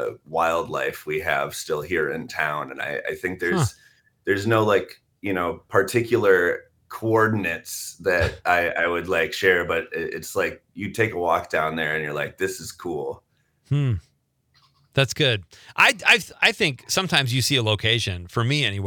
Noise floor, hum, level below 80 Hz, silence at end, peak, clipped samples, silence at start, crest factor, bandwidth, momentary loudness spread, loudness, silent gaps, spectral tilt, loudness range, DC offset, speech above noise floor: -66 dBFS; none; -54 dBFS; 0 s; -4 dBFS; under 0.1%; 0 s; 20 dB; 19.5 kHz; 11 LU; -22 LUFS; none; -4 dB/octave; 6 LU; under 0.1%; 43 dB